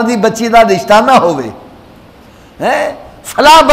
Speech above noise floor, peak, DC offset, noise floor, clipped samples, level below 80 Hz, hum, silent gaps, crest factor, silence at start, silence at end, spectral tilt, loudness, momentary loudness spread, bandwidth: 30 dB; 0 dBFS; under 0.1%; -38 dBFS; 0.1%; -38 dBFS; none; none; 10 dB; 0 s; 0 s; -4 dB/octave; -9 LUFS; 14 LU; 16.5 kHz